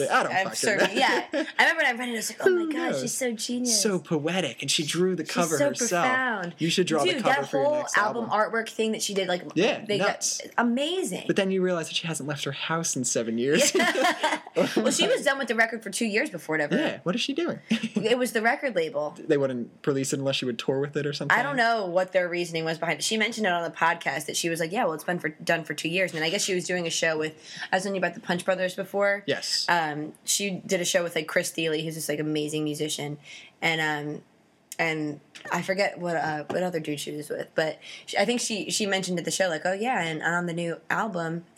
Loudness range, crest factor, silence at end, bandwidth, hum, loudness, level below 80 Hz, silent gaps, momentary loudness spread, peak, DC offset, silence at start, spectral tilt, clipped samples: 4 LU; 22 dB; 0.15 s; 16 kHz; none; -26 LUFS; -82 dBFS; none; 7 LU; -4 dBFS; under 0.1%; 0 s; -3 dB/octave; under 0.1%